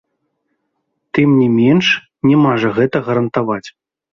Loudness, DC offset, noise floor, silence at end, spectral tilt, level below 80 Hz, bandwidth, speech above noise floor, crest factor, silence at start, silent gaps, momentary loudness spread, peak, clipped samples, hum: -14 LUFS; under 0.1%; -70 dBFS; 0.45 s; -7 dB/octave; -54 dBFS; 7 kHz; 58 dB; 14 dB; 1.15 s; none; 8 LU; -2 dBFS; under 0.1%; none